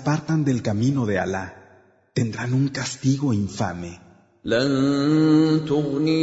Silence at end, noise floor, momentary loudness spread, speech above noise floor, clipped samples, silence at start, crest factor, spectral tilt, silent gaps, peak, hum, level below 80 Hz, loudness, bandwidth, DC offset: 0 s; -55 dBFS; 12 LU; 34 dB; under 0.1%; 0 s; 16 dB; -6.5 dB/octave; none; -6 dBFS; none; -56 dBFS; -22 LUFS; 8 kHz; under 0.1%